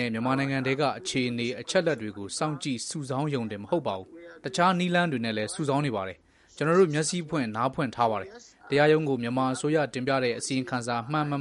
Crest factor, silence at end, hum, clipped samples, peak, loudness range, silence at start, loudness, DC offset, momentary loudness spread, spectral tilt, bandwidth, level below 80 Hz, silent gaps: 20 dB; 0 s; none; under 0.1%; -8 dBFS; 3 LU; 0 s; -27 LUFS; under 0.1%; 10 LU; -5 dB/octave; 11.5 kHz; -66 dBFS; none